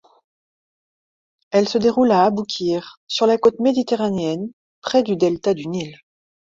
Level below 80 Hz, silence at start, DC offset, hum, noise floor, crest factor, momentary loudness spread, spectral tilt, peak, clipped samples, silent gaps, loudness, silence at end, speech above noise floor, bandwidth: -60 dBFS; 1.5 s; under 0.1%; none; under -90 dBFS; 18 dB; 12 LU; -5.5 dB/octave; -2 dBFS; under 0.1%; 2.97-3.07 s, 4.53-4.82 s; -19 LUFS; 0.5 s; over 72 dB; 7.8 kHz